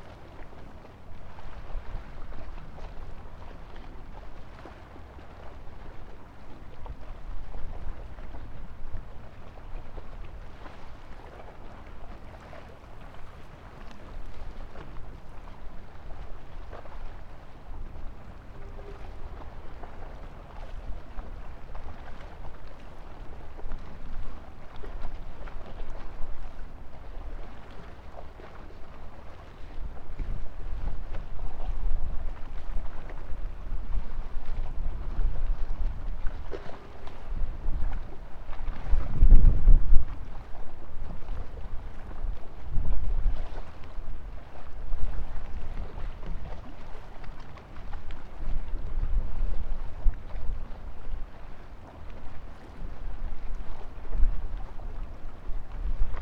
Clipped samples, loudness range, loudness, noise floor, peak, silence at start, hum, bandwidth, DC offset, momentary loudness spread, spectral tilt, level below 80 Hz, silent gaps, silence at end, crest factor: under 0.1%; 16 LU; -39 LUFS; -44 dBFS; 0 dBFS; 0 s; none; 3.6 kHz; under 0.1%; 13 LU; -7.5 dB/octave; -30 dBFS; none; 0 s; 24 dB